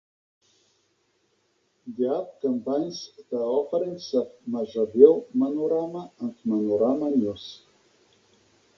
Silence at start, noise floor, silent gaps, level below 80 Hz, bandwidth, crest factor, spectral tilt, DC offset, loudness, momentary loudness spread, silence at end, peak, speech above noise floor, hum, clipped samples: 1.85 s; -70 dBFS; none; -70 dBFS; 7 kHz; 24 dB; -7 dB/octave; under 0.1%; -25 LUFS; 17 LU; 1.2 s; -2 dBFS; 45 dB; none; under 0.1%